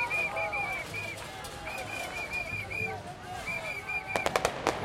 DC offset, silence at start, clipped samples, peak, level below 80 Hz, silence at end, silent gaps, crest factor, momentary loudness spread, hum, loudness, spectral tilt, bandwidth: under 0.1%; 0 s; under 0.1%; -6 dBFS; -54 dBFS; 0 s; none; 28 dB; 10 LU; none; -33 LUFS; -3.5 dB/octave; 16.5 kHz